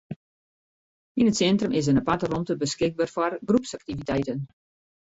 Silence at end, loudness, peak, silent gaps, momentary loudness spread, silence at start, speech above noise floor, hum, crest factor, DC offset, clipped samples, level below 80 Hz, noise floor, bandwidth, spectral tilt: 0.65 s; -25 LUFS; -10 dBFS; 0.16-1.15 s; 12 LU; 0.1 s; over 66 dB; none; 16 dB; under 0.1%; under 0.1%; -54 dBFS; under -90 dBFS; 8 kHz; -5.5 dB/octave